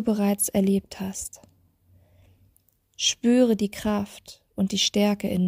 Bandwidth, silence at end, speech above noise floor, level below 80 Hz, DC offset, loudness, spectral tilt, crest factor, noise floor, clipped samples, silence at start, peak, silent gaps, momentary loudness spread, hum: 16 kHz; 0 s; 41 dB; -56 dBFS; under 0.1%; -24 LUFS; -4.5 dB/octave; 16 dB; -65 dBFS; under 0.1%; 0 s; -8 dBFS; none; 15 LU; none